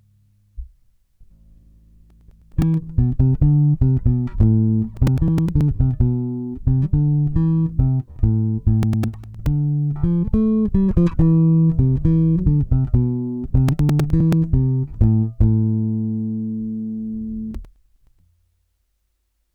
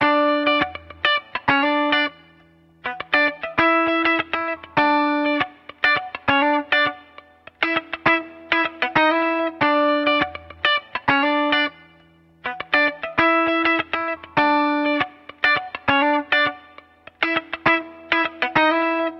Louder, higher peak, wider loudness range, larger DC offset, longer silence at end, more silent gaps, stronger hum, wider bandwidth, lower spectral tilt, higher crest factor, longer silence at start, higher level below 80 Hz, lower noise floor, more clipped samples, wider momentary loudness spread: about the same, -19 LUFS vs -20 LUFS; second, -6 dBFS vs -2 dBFS; first, 6 LU vs 1 LU; neither; first, 1.9 s vs 0 s; neither; neither; about the same, 6 kHz vs 6.6 kHz; first, -10.5 dB/octave vs -6 dB/octave; second, 12 dB vs 18 dB; first, 0.55 s vs 0 s; first, -28 dBFS vs -56 dBFS; first, -69 dBFS vs -53 dBFS; neither; first, 10 LU vs 7 LU